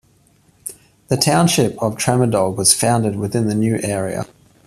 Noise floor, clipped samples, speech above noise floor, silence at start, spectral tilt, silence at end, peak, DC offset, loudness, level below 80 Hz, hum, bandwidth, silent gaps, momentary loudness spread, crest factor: -55 dBFS; under 0.1%; 38 dB; 0.65 s; -4.5 dB/octave; 0.4 s; 0 dBFS; under 0.1%; -17 LUFS; -52 dBFS; none; 15 kHz; none; 19 LU; 18 dB